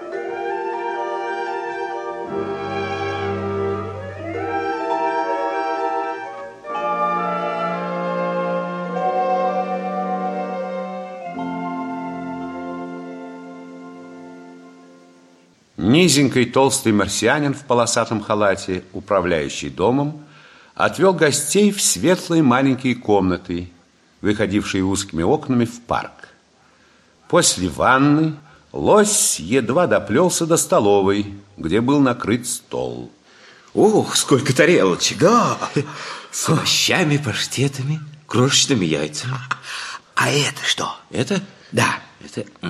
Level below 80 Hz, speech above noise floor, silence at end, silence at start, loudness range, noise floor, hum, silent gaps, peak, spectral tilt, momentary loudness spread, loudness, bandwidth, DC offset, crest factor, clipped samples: -52 dBFS; 37 dB; 0 s; 0 s; 8 LU; -54 dBFS; none; none; 0 dBFS; -4 dB/octave; 15 LU; -19 LUFS; 14 kHz; under 0.1%; 18 dB; under 0.1%